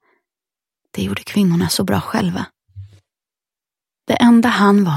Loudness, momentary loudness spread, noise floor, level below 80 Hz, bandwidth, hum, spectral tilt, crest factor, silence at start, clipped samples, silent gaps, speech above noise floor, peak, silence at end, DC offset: -16 LUFS; 17 LU; -89 dBFS; -52 dBFS; 16 kHz; none; -5.5 dB/octave; 18 dB; 0.95 s; under 0.1%; none; 75 dB; 0 dBFS; 0 s; under 0.1%